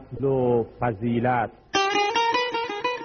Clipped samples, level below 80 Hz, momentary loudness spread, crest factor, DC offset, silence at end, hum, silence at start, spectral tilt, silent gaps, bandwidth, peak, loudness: under 0.1%; -52 dBFS; 5 LU; 14 dB; under 0.1%; 0 s; none; 0 s; -3.5 dB/octave; none; 6.8 kHz; -10 dBFS; -24 LUFS